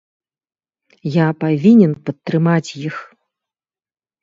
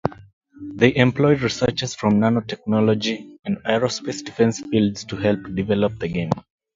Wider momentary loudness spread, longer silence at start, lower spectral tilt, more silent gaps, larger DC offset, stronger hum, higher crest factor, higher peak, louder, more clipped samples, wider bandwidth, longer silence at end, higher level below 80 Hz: first, 16 LU vs 11 LU; first, 1.05 s vs 0.05 s; first, -8 dB/octave vs -6 dB/octave; second, none vs 0.33-0.41 s; neither; neither; about the same, 18 dB vs 20 dB; about the same, 0 dBFS vs 0 dBFS; first, -15 LUFS vs -21 LUFS; neither; about the same, 7.6 kHz vs 7.6 kHz; first, 1.2 s vs 0.35 s; second, -62 dBFS vs -48 dBFS